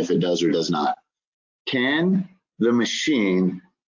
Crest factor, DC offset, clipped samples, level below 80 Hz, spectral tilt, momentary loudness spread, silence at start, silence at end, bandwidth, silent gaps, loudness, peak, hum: 14 dB; under 0.1%; under 0.1%; -66 dBFS; -5 dB/octave; 7 LU; 0 s; 0.3 s; 7.6 kHz; 1.27-1.65 s; -22 LUFS; -8 dBFS; none